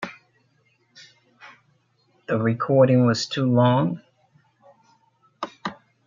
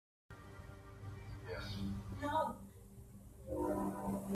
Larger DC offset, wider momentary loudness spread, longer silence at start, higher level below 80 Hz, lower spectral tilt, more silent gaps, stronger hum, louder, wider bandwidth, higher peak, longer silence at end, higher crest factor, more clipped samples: neither; about the same, 19 LU vs 19 LU; second, 0 s vs 0.3 s; second, -68 dBFS vs -56 dBFS; about the same, -7 dB/octave vs -6.5 dB/octave; neither; neither; first, -21 LUFS vs -42 LUFS; second, 7.4 kHz vs 15.5 kHz; first, -6 dBFS vs -24 dBFS; first, 0.35 s vs 0 s; about the same, 20 dB vs 18 dB; neither